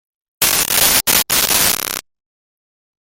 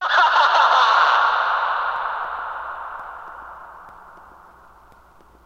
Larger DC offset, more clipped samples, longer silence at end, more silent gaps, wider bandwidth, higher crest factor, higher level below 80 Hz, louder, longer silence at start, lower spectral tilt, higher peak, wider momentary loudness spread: neither; neither; second, 1.05 s vs 1.35 s; neither; first, over 20 kHz vs 9 kHz; about the same, 18 dB vs 18 dB; first, -44 dBFS vs -58 dBFS; first, -12 LUFS vs -17 LUFS; first, 0.4 s vs 0 s; about the same, 0 dB/octave vs 0 dB/octave; first, 0 dBFS vs -4 dBFS; second, 9 LU vs 22 LU